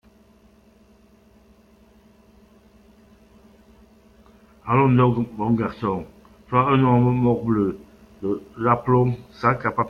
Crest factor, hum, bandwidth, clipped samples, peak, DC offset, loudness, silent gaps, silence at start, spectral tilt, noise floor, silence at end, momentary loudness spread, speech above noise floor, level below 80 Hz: 20 dB; none; 5.4 kHz; under 0.1%; -4 dBFS; under 0.1%; -21 LUFS; none; 4.65 s; -10 dB/octave; -54 dBFS; 0 s; 11 LU; 34 dB; -52 dBFS